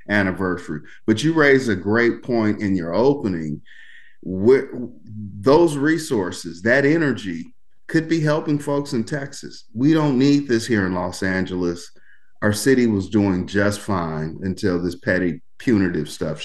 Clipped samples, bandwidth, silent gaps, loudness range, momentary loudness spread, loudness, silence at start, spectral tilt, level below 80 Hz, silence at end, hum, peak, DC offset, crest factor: under 0.1%; 12.5 kHz; none; 2 LU; 14 LU; -20 LUFS; 0.1 s; -6 dB/octave; -54 dBFS; 0 s; none; -2 dBFS; 1%; 18 dB